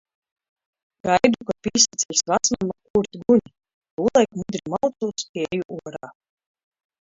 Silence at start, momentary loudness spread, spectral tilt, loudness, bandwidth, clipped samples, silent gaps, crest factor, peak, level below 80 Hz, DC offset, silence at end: 1.05 s; 13 LU; -3 dB/octave; -21 LUFS; 7.8 kHz; under 0.1%; 2.90-2.94 s, 3.74-3.82 s, 3.91-3.97 s, 5.29-5.34 s, 5.65-5.69 s; 22 dB; -2 dBFS; -56 dBFS; under 0.1%; 0.9 s